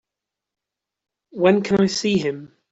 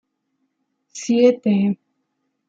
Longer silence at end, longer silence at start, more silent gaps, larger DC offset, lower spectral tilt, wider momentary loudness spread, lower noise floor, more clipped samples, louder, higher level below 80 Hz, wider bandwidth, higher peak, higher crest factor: second, 0.25 s vs 0.75 s; first, 1.35 s vs 0.95 s; neither; neither; about the same, -5.5 dB/octave vs -6.5 dB/octave; about the same, 16 LU vs 16 LU; first, -85 dBFS vs -73 dBFS; neither; about the same, -19 LUFS vs -18 LUFS; first, -58 dBFS vs -72 dBFS; about the same, 8 kHz vs 7.8 kHz; about the same, -4 dBFS vs -4 dBFS; about the same, 20 dB vs 18 dB